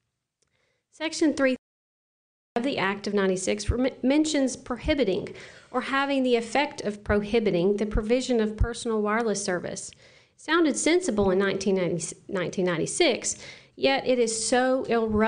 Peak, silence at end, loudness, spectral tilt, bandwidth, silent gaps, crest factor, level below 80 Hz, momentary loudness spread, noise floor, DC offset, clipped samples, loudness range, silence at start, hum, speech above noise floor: -10 dBFS; 0 s; -25 LUFS; -4 dB/octave; 10 kHz; 1.58-2.56 s; 16 dB; -42 dBFS; 9 LU; -76 dBFS; under 0.1%; under 0.1%; 2 LU; 1 s; none; 51 dB